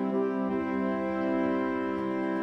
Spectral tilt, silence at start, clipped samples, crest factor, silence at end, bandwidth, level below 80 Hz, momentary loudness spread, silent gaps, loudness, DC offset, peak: -8.5 dB/octave; 0 s; under 0.1%; 12 dB; 0 s; 6.2 kHz; -62 dBFS; 3 LU; none; -30 LUFS; under 0.1%; -16 dBFS